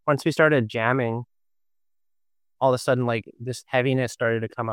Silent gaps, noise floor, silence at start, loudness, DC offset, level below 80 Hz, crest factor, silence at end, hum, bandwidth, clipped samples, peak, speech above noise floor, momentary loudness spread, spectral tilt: none; under -90 dBFS; 0.05 s; -23 LUFS; under 0.1%; -68 dBFS; 20 dB; 0 s; none; 16 kHz; under 0.1%; -4 dBFS; over 67 dB; 10 LU; -6 dB/octave